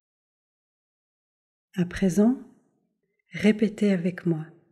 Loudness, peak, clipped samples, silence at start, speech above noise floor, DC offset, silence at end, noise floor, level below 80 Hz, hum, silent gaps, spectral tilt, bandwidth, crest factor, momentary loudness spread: -25 LUFS; -8 dBFS; under 0.1%; 1.75 s; 51 dB; under 0.1%; 0.25 s; -75 dBFS; -56 dBFS; none; none; -7 dB/octave; 12.5 kHz; 18 dB; 11 LU